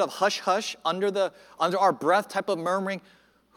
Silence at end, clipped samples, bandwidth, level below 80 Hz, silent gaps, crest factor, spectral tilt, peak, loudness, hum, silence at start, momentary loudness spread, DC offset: 0.55 s; under 0.1%; 17.5 kHz; -76 dBFS; none; 18 dB; -4 dB/octave; -10 dBFS; -26 LUFS; none; 0 s; 6 LU; under 0.1%